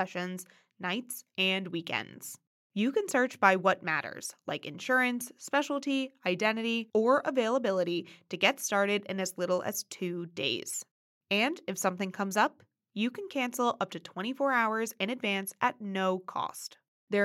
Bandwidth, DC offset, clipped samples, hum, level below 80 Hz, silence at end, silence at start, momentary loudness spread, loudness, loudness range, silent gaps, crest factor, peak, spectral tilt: 16.5 kHz; under 0.1%; under 0.1%; none; -88 dBFS; 0 s; 0 s; 11 LU; -31 LUFS; 3 LU; 2.47-2.70 s, 10.91-11.21 s, 16.88-17.08 s; 24 dB; -8 dBFS; -3.5 dB/octave